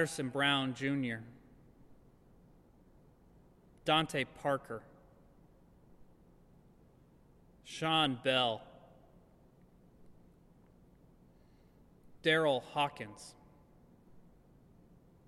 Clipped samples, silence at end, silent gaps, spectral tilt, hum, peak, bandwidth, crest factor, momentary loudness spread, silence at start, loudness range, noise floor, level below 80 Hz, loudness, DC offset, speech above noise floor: under 0.1%; 1.05 s; none; -4.5 dB/octave; none; -16 dBFS; 13.5 kHz; 22 dB; 18 LU; 0 s; 8 LU; -63 dBFS; -68 dBFS; -34 LUFS; under 0.1%; 30 dB